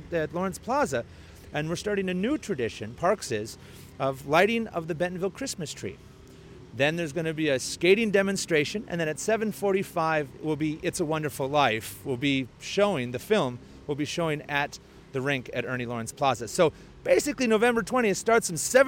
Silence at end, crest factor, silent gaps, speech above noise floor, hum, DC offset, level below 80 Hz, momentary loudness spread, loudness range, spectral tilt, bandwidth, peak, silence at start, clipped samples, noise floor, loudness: 0 s; 18 dB; none; 21 dB; none; under 0.1%; -56 dBFS; 10 LU; 4 LU; -4.5 dB/octave; 17 kHz; -8 dBFS; 0 s; under 0.1%; -48 dBFS; -27 LUFS